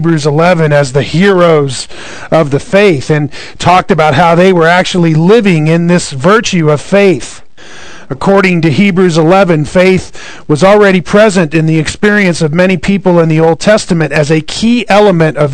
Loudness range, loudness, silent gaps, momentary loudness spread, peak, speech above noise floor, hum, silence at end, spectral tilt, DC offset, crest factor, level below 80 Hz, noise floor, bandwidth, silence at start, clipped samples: 2 LU; -8 LUFS; none; 7 LU; 0 dBFS; 24 dB; none; 0 s; -6 dB/octave; 3%; 8 dB; -38 dBFS; -32 dBFS; 12 kHz; 0 s; 5%